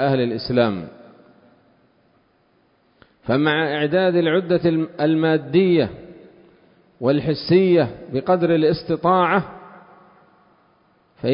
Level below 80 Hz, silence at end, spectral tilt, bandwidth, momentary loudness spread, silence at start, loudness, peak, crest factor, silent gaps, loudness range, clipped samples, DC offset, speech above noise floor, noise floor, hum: -54 dBFS; 0 s; -11.5 dB/octave; 5.4 kHz; 10 LU; 0 s; -19 LUFS; -4 dBFS; 16 dB; none; 7 LU; under 0.1%; under 0.1%; 42 dB; -61 dBFS; none